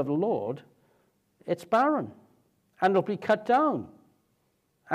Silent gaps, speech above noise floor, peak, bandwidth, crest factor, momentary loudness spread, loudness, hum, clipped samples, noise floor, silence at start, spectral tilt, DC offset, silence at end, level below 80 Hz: none; 46 dB; -10 dBFS; 14 kHz; 18 dB; 17 LU; -27 LUFS; none; under 0.1%; -72 dBFS; 0 s; -7 dB/octave; under 0.1%; 0 s; -78 dBFS